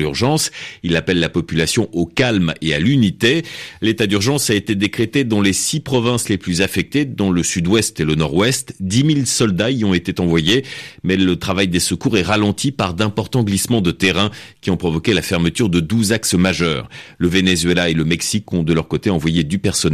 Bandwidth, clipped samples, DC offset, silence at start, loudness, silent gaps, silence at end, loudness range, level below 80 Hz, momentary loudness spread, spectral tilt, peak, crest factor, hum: 14.5 kHz; under 0.1%; under 0.1%; 0 s; -17 LUFS; none; 0 s; 1 LU; -44 dBFS; 5 LU; -4.5 dB/octave; -2 dBFS; 14 dB; none